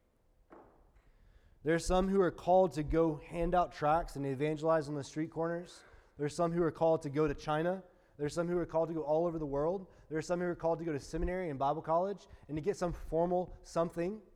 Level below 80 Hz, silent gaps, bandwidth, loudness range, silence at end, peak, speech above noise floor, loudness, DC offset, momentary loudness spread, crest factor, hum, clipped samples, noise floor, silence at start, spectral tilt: -50 dBFS; none; 13.5 kHz; 4 LU; 0.15 s; -18 dBFS; 36 dB; -34 LUFS; under 0.1%; 9 LU; 16 dB; none; under 0.1%; -70 dBFS; 0.5 s; -6.5 dB/octave